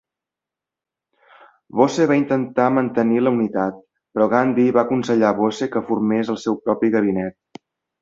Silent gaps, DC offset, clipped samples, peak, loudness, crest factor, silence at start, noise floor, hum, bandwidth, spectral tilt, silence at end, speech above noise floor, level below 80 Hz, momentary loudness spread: none; under 0.1%; under 0.1%; -2 dBFS; -19 LUFS; 18 dB; 1.75 s; -87 dBFS; none; 7.8 kHz; -7 dB/octave; 0.7 s; 69 dB; -60 dBFS; 7 LU